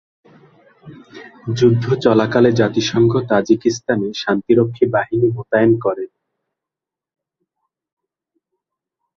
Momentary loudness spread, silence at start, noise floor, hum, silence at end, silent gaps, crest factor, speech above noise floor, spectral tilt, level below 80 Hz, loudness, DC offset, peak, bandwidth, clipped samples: 7 LU; 0.85 s; -86 dBFS; none; 3.1 s; none; 18 dB; 71 dB; -6.5 dB/octave; -54 dBFS; -16 LUFS; under 0.1%; -2 dBFS; 7.2 kHz; under 0.1%